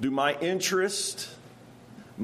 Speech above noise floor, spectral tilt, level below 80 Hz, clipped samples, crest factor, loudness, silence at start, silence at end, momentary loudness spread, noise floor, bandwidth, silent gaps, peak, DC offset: 23 dB; -3 dB/octave; -70 dBFS; under 0.1%; 18 dB; -27 LUFS; 0 s; 0 s; 18 LU; -50 dBFS; 15 kHz; none; -12 dBFS; under 0.1%